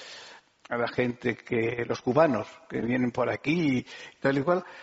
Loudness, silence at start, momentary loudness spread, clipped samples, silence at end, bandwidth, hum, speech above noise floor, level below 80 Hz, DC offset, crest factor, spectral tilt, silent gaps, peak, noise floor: -28 LUFS; 0 s; 11 LU; under 0.1%; 0 s; 8 kHz; none; 23 dB; -62 dBFS; under 0.1%; 20 dB; -5.5 dB/octave; none; -8 dBFS; -51 dBFS